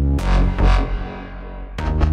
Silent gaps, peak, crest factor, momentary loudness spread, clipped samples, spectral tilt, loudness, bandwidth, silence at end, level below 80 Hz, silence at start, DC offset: none; -4 dBFS; 14 dB; 15 LU; under 0.1%; -7.5 dB/octave; -21 LUFS; 8.2 kHz; 0 s; -18 dBFS; 0 s; under 0.1%